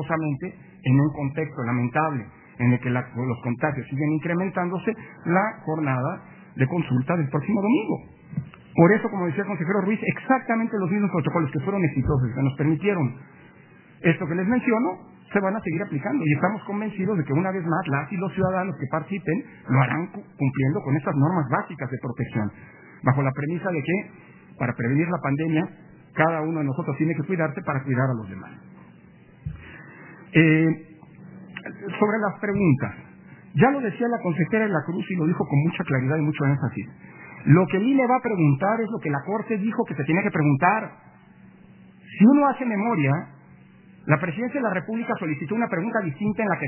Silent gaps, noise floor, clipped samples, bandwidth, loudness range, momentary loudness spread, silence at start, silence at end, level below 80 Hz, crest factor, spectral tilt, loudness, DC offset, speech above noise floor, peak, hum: none; -50 dBFS; under 0.1%; 3.2 kHz; 4 LU; 12 LU; 0 s; 0 s; -54 dBFS; 22 dB; -12 dB/octave; -24 LUFS; under 0.1%; 27 dB; -2 dBFS; none